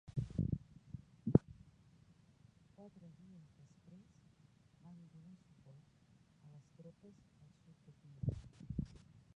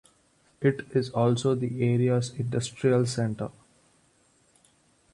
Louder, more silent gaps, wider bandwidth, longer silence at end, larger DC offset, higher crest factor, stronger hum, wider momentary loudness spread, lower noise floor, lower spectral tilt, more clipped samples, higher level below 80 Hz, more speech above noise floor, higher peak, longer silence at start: second, -41 LUFS vs -27 LUFS; neither; second, 9.2 kHz vs 11.5 kHz; second, 0.5 s vs 1.65 s; neither; first, 34 dB vs 18 dB; neither; first, 26 LU vs 6 LU; about the same, -68 dBFS vs -65 dBFS; first, -10.5 dB/octave vs -6.5 dB/octave; neither; about the same, -60 dBFS vs -62 dBFS; second, 17 dB vs 39 dB; about the same, -12 dBFS vs -10 dBFS; second, 0.1 s vs 0.6 s